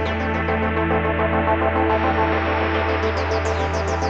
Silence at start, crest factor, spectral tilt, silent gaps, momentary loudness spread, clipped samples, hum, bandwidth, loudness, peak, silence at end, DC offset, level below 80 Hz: 0 s; 14 dB; -6.5 dB/octave; none; 3 LU; under 0.1%; none; 7.8 kHz; -20 LUFS; -6 dBFS; 0 s; under 0.1%; -32 dBFS